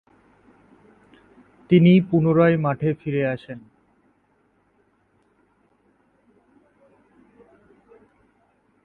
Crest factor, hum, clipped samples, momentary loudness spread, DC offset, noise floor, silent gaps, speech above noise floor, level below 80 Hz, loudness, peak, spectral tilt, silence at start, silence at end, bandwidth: 20 dB; none; under 0.1%; 17 LU; under 0.1%; -64 dBFS; none; 46 dB; -60 dBFS; -19 LUFS; -4 dBFS; -10.5 dB/octave; 1.7 s; 5.25 s; 4.2 kHz